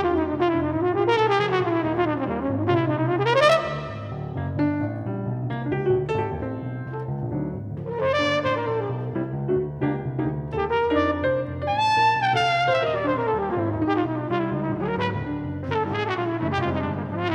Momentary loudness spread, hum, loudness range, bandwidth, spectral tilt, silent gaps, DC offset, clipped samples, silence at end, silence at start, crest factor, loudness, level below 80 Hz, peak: 9 LU; none; 5 LU; 11 kHz; -7 dB/octave; none; under 0.1%; under 0.1%; 0 s; 0 s; 20 dB; -24 LUFS; -48 dBFS; -4 dBFS